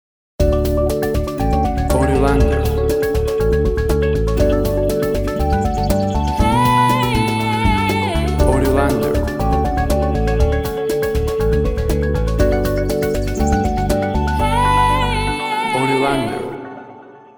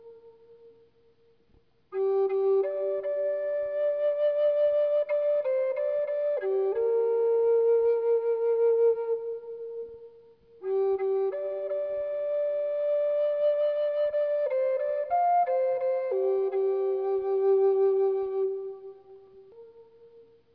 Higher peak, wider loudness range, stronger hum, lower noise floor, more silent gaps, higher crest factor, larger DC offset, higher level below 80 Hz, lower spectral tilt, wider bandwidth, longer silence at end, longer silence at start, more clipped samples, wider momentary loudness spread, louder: first, -2 dBFS vs -16 dBFS; second, 2 LU vs 5 LU; neither; second, -39 dBFS vs -65 dBFS; neither; about the same, 14 dB vs 10 dB; neither; first, -22 dBFS vs -74 dBFS; about the same, -6.5 dB/octave vs -7.5 dB/octave; first, over 20 kHz vs 4.9 kHz; second, 0.2 s vs 0.35 s; first, 0.4 s vs 0.05 s; neither; second, 5 LU vs 8 LU; first, -17 LUFS vs -27 LUFS